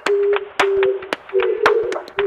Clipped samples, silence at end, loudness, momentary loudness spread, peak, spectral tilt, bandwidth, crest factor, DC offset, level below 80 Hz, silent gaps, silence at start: under 0.1%; 0 s; -18 LUFS; 6 LU; 0 dBFS; -3.5 dB/octave; 12 kHz; 18 dB; under 0.1%; -56 dBFS; none; 0.05 s